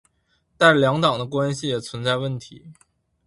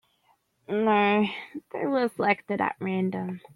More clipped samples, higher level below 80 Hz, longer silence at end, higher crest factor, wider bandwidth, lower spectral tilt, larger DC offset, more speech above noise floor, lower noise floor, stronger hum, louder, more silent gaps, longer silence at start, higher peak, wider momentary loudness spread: neither; first, -58 dBFS vs -72 dBFS; first, 0.55 s vs 0.2 s; about the same, 20 dB vs 20 dB; about the same, 11.5 kHz vs 11 kHz; second, -5 dB/octave vs -7.5 dB/octave; neither; first, 46 dB vs 42 dB; about the same, -67 dBFS vs -68 dBFS; neither; first, -20 LUFS vs -26 LUFS; neither; about the same, 0.6 s vs 0.7 s; first, -2 dBFS vs -6 dBFS; about the same, 11 LU vs 11 LU